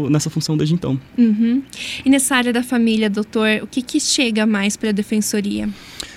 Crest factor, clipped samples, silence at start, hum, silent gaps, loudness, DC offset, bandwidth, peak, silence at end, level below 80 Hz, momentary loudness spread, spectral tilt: 16 dB; under 0.1%; 0 s; none; none; -18 LUFS; under 0.1%; 16 kHz; -2 dBFS; 0 s; -50 dBFS; 7 LU; -4.5 dB/octave